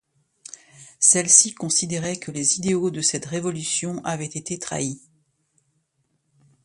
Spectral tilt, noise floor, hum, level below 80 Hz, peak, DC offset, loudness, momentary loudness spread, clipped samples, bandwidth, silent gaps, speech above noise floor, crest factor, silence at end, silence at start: -2.5 dB/octave; -71 dBFS; none; -62 dBFS; 0 dBFS; under 0.1%; -20 LUFS; 16 LU; under 0.1%; 11.5 kHz; none; 49 dB; 24 dB; 1.65 s; 0.8 s